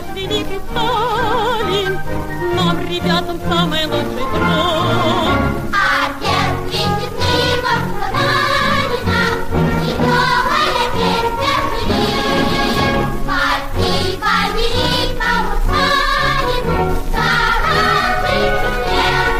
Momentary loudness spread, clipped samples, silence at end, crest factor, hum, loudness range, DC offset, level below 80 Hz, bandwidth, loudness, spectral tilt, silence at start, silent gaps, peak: 5 LU; under 0.1%; 0 s; 12 dB; none; 2 LU; under 0.1%; -26 dBFS; 15.5 kHz; -16 LUFS; -4.5 dB/octave; 0 s; none; -4 dBFS